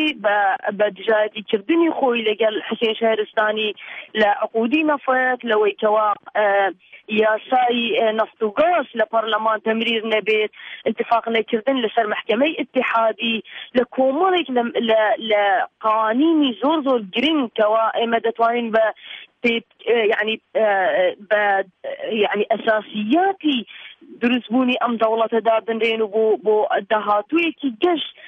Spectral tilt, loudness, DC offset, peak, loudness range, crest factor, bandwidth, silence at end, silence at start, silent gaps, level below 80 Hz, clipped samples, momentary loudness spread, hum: -6 dB/octave; -19 LUFS; under 0.1%; -6 dBFS; 2 LU; 14 dB; 6 kHz; 0 s; 0 s; none; -68 dBFS; under 0.1%; 5 LU; none